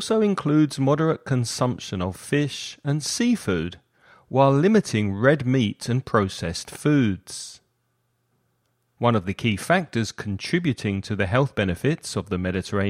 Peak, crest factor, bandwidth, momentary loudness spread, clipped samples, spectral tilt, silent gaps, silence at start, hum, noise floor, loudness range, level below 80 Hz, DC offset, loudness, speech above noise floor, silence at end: -4 dBFS; 18 dB; 15.5 kHz; 9 LU; under 0.1%; -6 dB/octave; none; 0 s; none; -71 dBFS; 5 LU; -54 dBFS; under 0.1%; -23 LUFS; 49 dB; 0 s